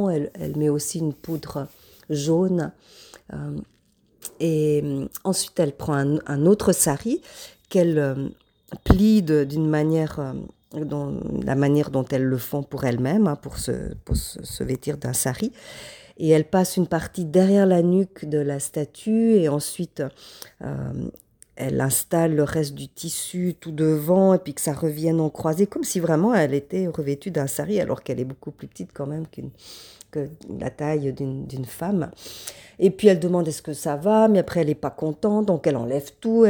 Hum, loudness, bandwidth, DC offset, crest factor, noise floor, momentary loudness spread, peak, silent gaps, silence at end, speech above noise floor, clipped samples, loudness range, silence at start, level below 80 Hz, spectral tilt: none; -23 LUFS; over 20 kHz; under 0.1%; 22 dB; -56 dBFS; 16 LU; -2 dBFS; none; 0 s; 33 dB; under 0.1%; 7 LU; 0 s; -42 dBFS; -6 dB/octave